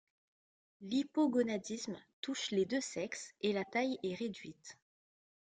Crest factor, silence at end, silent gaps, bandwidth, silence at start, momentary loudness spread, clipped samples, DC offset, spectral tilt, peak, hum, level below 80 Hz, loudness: 16 dB; 0.75 s; 2.13-2.23 s; 9.6 kHz; 0.8 s; 16 LU; under 0.1%; under 0.1%; -4 dB/octave; -22 dBFS; none; -80 dBFS; -37 LUFS